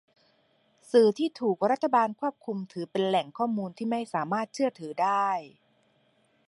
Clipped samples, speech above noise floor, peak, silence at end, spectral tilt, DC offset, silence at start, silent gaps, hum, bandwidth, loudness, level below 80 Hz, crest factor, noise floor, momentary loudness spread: under 0.1%; 41 dB; -10 dBFS; 1 s; -6 dB/octave; under 0.1%; 0.95 s; none; none; 11.5 kHz; -28 LUFS; -82 dBFS; 20 dB; -68 dBFS; 10 LU